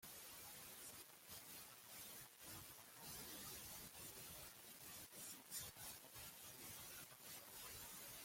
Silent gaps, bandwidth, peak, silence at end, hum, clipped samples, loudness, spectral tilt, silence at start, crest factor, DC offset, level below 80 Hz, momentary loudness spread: none; 16.5 kHz; -36 dBFS; 0 s; none; under 0.1%; -55 LUFS; -1.5 dB/octave; 0 s; 22 dB; under 0.1%; -78 dBFS; 5 LU